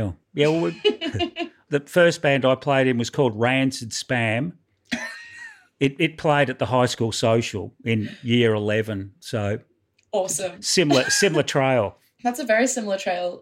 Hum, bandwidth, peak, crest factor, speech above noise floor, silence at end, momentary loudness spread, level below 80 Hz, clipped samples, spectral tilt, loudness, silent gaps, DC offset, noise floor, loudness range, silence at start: none; 16.5 kHz; -6 dBFS; 16 dB; 21 dB; 0 s; 11 LU; -58 dBFS; under 0.1%; -4.5 dB/octave; -22 LUFS; none; under 0.1%; -43 dBFS; 3 LU; 0 s